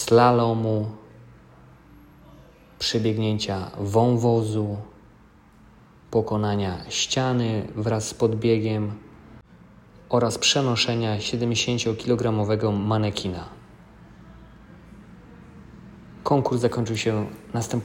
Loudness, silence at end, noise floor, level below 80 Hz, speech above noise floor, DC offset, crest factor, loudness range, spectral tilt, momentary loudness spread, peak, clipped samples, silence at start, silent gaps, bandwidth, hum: -23 LUFS; 0 s; -52 dBFS; -52 dBFS; 30 dB; under 0.1%; 20 dB; 6 LU; -5 dB/octave; 11 LU; -4 dBFS; under 0.1%; 0 s; none; 16 kHz; none